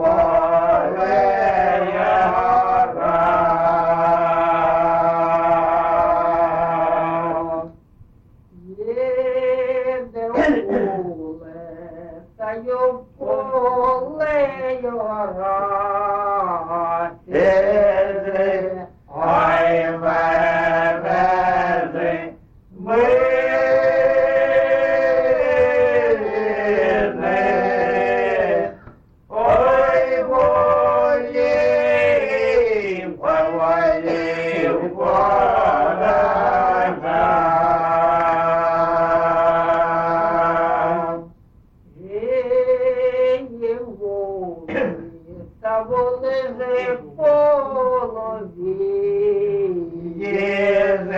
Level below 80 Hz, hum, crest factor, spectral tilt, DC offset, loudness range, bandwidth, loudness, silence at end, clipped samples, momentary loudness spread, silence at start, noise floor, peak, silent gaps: -46 dBFS; none; 12 dB; -7 dB/octave; under 0.1%; 6 LU; 7.4 kHz; -18 LUFS; 0 s; under 0.1%; 10 LU; 0 s; -50 dBFS; -6 dBFS; none